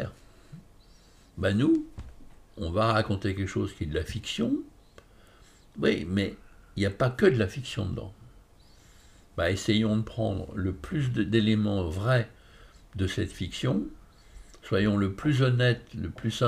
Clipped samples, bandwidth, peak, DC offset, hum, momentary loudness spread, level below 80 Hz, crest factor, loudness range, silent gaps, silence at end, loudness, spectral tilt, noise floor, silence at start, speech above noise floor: under 0.1%; 13.5 kHz; -8 dBFS; under 0.1%; none; 15 LU; -48 dBFS; 20 dB; 3 LU; none; 0 s; -28 LUFS; -6.5 dB/octave; -56 dBFS; 0 s; 29 dB